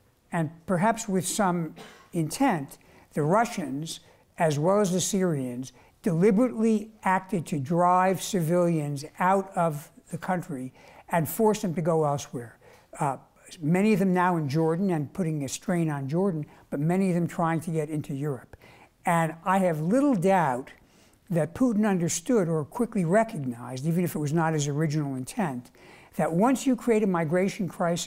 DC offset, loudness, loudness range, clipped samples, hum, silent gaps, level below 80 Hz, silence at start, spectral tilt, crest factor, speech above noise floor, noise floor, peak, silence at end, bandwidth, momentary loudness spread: under 0.1%; -26 LUFS; 3 LU; under 0.1%; none; none; -60 dBFS; 0.3 s; -6 dB/octave; 16 dB; 33 dB; -58 dBFS; -10 dBFS; 0 s; 16 kHz; 11 LU